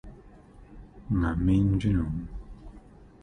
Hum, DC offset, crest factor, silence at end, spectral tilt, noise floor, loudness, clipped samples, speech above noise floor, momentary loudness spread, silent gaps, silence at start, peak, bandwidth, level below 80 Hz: none; under 0.1%; 16 dB; 0.15 s; -9 dB/octave; -51 dBFS; -27 LUFS; under 0.1%; 26 dB; 24 LU; none; 0.05 s; -12 dBFS; 9.6 kHz; -38 dBFS